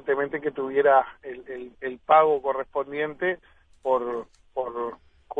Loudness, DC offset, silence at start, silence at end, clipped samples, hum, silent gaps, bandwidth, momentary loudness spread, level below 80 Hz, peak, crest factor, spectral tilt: -25 LUFS; under 0.1%; 0.05 s; 0 s; under 0.1%; none; none; 3.9 kHz; 17 LU; -62 dBFS; -6 dBFS; 20 dB; -7 dB/octave